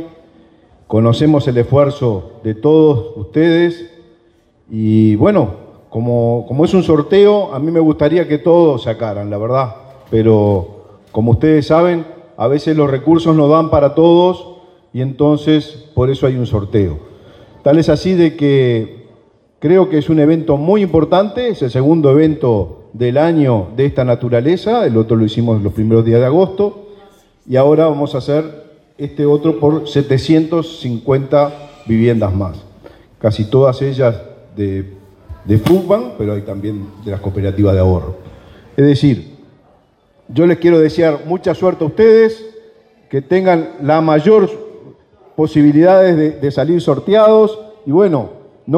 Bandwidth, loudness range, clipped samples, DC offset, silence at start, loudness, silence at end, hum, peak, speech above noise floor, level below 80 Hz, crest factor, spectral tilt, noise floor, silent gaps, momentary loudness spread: 9.6 kHz; 4 LU; under 0.1%; under 0.1%; 0 s; -13 LUFS; 0 s; none; 0 dBFS; 41 dB; -42 dBFS; 12 dB; -8.5 dB/octave; -52 dBFS; none; 12 LU